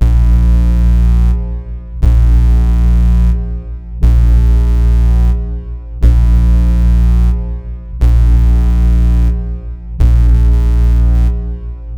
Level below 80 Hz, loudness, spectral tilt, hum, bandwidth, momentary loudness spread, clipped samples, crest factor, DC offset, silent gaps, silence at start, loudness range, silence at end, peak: -10 dBFS; -12 LUFS; -9 dB/octave; none; 3.5 kHz; 13 LU; 0.2%; 10 dB; under 0.1%; none; 0 s; 1 LU; 0 s; 0 dBFS